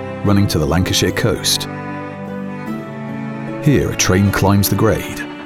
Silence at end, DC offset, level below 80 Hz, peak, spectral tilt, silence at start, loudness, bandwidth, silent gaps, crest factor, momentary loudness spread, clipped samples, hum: 0 s; under 0.1%; -36 dBFS; 0 dBFS; -4.5 dB/octave; 0 s; -17 LUFS; 17 kHz; none; 16 dB; 13 LU; under 0.1%; none